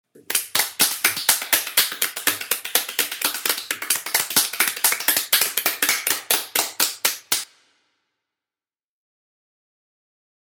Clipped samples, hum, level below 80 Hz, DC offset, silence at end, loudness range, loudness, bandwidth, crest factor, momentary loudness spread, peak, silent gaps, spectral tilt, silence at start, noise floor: under 0.1%; none; -72 dBFS; under 0.1%; 3 s; 7 LU; -20 LUFS; over 20 kHz; 24 dB; 6 LU; 0 dBFS; none; 1.5 dB/octave; 0.15 s; under -90 dBFS